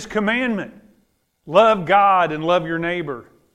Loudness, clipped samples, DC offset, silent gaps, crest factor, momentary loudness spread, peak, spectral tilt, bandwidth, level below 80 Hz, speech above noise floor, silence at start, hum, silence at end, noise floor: -18 LUFS; under 0.1%; under 0.1%; none; 18 dB; 14 LU; 0 dBFS; -5.5 dB/octave; 11 kHz; -54 dBFS; 46 dB; 0 s; none; 0.3 s; -64 dBFS